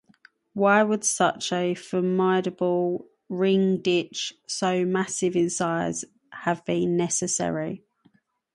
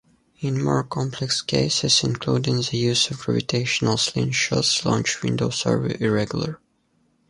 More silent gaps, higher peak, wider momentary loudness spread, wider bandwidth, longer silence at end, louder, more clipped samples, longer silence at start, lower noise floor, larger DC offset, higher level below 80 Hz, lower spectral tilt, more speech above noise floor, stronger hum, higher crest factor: neither; about the same, -6 dBFS vs -4 dBFS; about the same, 10 LU vs 8 LU; about the same, 11.5 kHz vs 11.5 kHz; about the same, 0.75 s vs 0.75 s; second, -25 LUFS vs -22 LUFS; neither; first, 0.55 s vs 0.4 s; about the same, -63 dBFS vs -65 dBFS; neither; second, -68 dBFS vs -52 dBFS; about the same, -4.5 dB/octave vs -4 dB/octave; second, 39 dB vs 43 dB; neither; about the same, 20 dB vs 18 dB